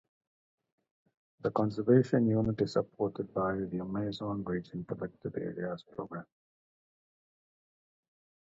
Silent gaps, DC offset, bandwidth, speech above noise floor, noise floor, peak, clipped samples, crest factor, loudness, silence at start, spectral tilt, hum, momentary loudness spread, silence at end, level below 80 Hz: none; under 0.1%; 7.8 kHz; over 58 dB; under -90 dBFS; -12 dBFS; under 0.1%; 22 dB; -33 LUFS; 1.45 s; -8.5 dB/octave; none; 14 LU; 2.25 s; -64 dBFS